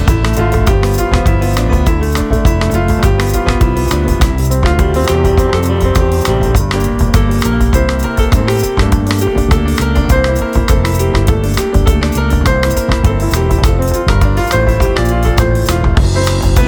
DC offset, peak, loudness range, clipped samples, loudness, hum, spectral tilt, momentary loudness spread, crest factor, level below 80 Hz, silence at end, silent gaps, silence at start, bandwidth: under 0.1%; 0 dBFS; 0 LU; under 0.1%; -13 LUFS; none; -6 dB/octave; 2 LU; 10 dB; -14 dBFS; 0 s; none; 0 s; over 20 kHz